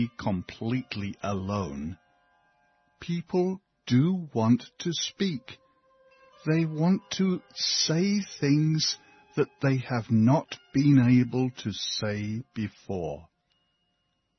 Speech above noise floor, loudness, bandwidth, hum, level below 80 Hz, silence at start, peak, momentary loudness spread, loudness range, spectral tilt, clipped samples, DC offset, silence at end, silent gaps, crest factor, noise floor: 49 dB; -27 LUFS; 6.4 kHz; none; -60 dBFS; 0 s; -10 dBFS; 13 LU; 7 LU; -5.5 dB/octave; under 0.1%; under 0.1%; 1.15 s; none; 18 dB; -76 dBFS